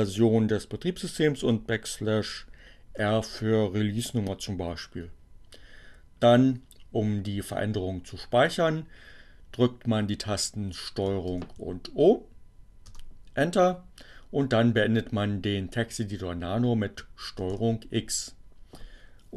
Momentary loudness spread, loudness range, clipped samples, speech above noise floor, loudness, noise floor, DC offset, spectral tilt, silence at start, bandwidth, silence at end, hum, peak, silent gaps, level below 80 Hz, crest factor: 14 LU; 4 LU; under 0.1%; 22 dB; -28 LUFS; -49 dBFS; under 0.1%; -5.5 dB/octave; 0 s; 13 kHz; 0 s; none; -8 dBFS; none; -50 dBFS; 20 dB